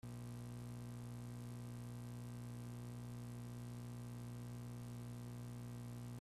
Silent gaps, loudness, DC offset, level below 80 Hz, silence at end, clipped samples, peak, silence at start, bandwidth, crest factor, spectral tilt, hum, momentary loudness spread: none; -51 LUFS; under 0.1%; -66 dBFS; 0 s; under 0.1%; -42 dBFS; 0.05 s; 14.5 kHz; 8 dB; -6.5 dB/octave; 60 Hz at -50 dBFS; 0 LU